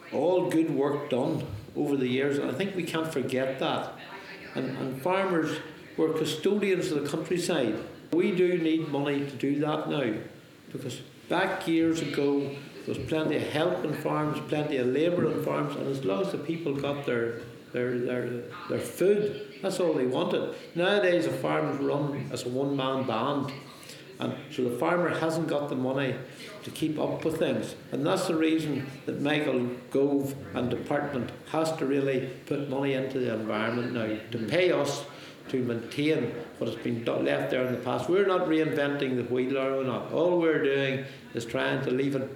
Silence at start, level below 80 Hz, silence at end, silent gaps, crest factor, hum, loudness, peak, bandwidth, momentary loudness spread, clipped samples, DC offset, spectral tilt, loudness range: 0 s; -68 dBFS; 0 s; none; 18 dB; none; -29 LUFS; -10 dBFS; 18.5 kHz; 10 LU; under 0.1%; under 0.1%; -6 dB/octave; 3 LU